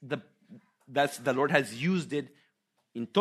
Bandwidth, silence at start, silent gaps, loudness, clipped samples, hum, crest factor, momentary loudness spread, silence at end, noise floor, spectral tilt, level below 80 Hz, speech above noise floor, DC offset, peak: 13.5 kHz; 0 s; none; -30 LUFS; under 0.1%; none; 24 dB; 14 LU; 0 s; -76 dBFS; -5.5 dB/octave; -76 dBFS; 47 dB; under 0.1%; -8 dBFS